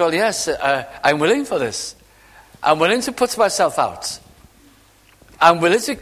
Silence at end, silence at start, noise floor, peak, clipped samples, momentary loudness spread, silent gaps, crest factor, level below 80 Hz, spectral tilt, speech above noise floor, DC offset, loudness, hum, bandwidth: 0 s; 0 s; -51 dBFS; 0 dBFS; under 0.1%; 11 LU; none; 20 dB; -54 dBFS; -3 dB/octave; 34 dB; under 0.1%; -18 LUFS; none; 15.5 kHz